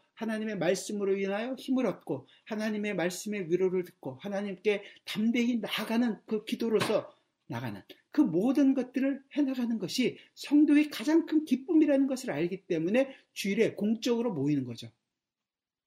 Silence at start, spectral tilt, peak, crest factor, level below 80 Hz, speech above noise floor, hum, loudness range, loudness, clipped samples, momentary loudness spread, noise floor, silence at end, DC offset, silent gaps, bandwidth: 0.2 s; -5.5 dB/octave; -12 dBFS; 18 dB; -78 dBFS; over 61 dB; none; 5 LU; -30 LUFS; under 0.1%; 12 LU; under -90 dBFS; 0.95 s; under 0.1%; none; 16 kHz